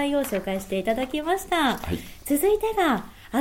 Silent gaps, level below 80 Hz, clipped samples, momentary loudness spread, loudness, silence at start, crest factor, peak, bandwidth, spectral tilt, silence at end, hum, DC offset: none; -46 dBFS; under 0.1%; 7 LU; -25 LUFS; 0 s; 16 dB; -8 dBFS; 17 kHz; -4.5 dB/octave; 0 s; none; under 0.1%